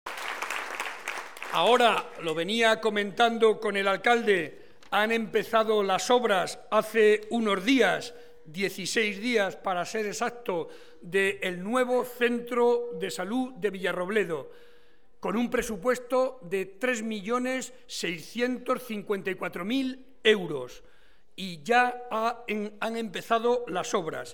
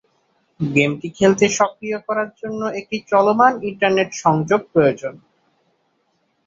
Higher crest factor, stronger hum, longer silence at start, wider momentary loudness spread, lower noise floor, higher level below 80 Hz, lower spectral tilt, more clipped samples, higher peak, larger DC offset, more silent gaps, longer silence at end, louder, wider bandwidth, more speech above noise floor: about the same, 20 dB vs 18 dB; neither; second, 0.05 s vs 0.6 s; about the same, 11 LU vs 12 LU; second, -62 dBFS vs -66 dBFS; second, -64 dBFS vs -58 dBFS; second, -3.5 dB/octave vs -5 dB/octave; neither; second, -8 dBFS vs -2 dBFS; first, 0.4% vs under 0.1%; neither; second, 0 s vs 1.3 s; second, -27 LUFS vs -18 LUFS; first, 18.5 kHz vs 7.8 kHz; second, 35 dB vs 48 dB